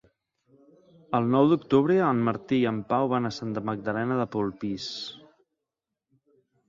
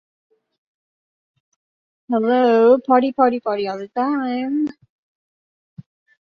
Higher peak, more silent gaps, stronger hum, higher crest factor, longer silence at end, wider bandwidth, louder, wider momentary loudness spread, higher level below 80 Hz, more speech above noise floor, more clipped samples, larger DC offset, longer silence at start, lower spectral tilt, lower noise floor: second, -8 dBFS vs -2 dBFS; neither; neither; about the same, 20 dB vs 18 dB; about the same, 1.5 s vs 1.55 s; first, 7.6 kHz vs 6.4 kHz; second, -26 LUFS vs -18 LUFS; about the same, 11 LU vs 10 LU; about the same, -64 dBFS vs -68 dBFS; second, 61 dB vs over 73 dB; neither; neither; second, 1.1 s vs 2.1 s; about the same, -7 dB/octave vs -7.5 dB/octave; second, -86 dBFS vs under -90 dBFS